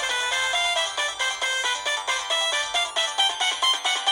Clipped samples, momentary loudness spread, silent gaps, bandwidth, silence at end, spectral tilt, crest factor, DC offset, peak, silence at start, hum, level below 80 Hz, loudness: under 0.1%; 4 LU; none; 17 kHz; 0 s; 3 dB/octave; 14 dB; under 0.1%; -10 dBFS; 0 s; none; -62 dBFS; -22 LUFS